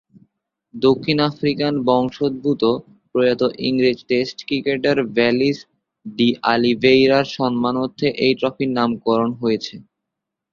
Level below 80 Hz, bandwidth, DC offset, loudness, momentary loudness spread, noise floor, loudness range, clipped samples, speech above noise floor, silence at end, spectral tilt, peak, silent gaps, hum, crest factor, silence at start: -58 dBFS; 7.2 kHz; under 0.1%; -19 LUFS; 6 LU; -82 dBFS; 2 LU; under 0.1%; 64 dB; 0.7 s; -6.5 dB/octave; -2 dBFS; none; none; 18 dB; 0.75 s